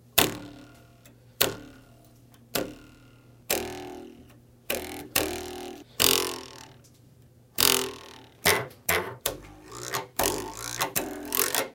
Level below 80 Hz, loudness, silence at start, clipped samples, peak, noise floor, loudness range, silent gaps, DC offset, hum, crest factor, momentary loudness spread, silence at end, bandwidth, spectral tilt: -54 dBFS; -27 LUFS; 0.15 s; under 0.1%; 0 dBFS; -56 dBFS; 8 LU; none; under 0.1%; none; 30 dB; 22 LU; 0 s; 17.5 kHz; -1.5 dB/octave